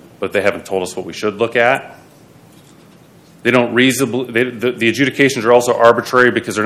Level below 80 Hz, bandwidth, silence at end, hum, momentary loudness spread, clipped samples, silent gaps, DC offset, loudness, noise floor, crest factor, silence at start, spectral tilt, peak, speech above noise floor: -60 dBFS; 15.5 kHz; 0 s; none; 10 LU; 0.2%; none; under 0.1%; -14 LUFS; -44 dBFS; 16 dB; 0.2 s; -4.5 dB/octave; 0 dBFS; 30 dB